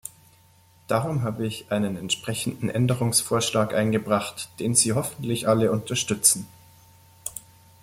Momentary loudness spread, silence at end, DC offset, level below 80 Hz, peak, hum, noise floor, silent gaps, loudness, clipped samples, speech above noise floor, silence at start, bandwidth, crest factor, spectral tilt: 15 LU; 0.45 s; under 0.1%; -58 dBFS; -4 dBFS; none; -56 dBFS; none; -24 LUFS; under 0.1%; 32 dB; 0.05 s; 16.5 kHz; 22 dB; -4 dB/octave